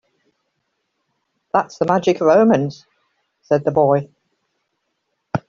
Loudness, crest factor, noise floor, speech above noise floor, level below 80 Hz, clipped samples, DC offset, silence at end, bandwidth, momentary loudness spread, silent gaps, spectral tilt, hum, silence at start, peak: -17 LUFS; 18 dB; -73 dBFS; 57 dB; -60 dBFS; under 0.1%; under 0.1%; 0.1 s; 7.4 kHz; 8 LU; none; -6.5 dB/octave; none; 1.55 s; -2 dBFS